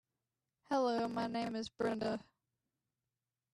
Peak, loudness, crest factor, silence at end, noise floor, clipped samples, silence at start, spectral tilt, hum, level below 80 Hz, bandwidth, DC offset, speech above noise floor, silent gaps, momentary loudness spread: -24 dBFS; -38 LUFS; 16 dB; 1.35 s; under -90 dBFS; under 0.1%; 0.7 s; -5.5 dB/octave; none; -76 dBFS; 12 kHz; under 0.1%; over 53 dB; none; 6 LU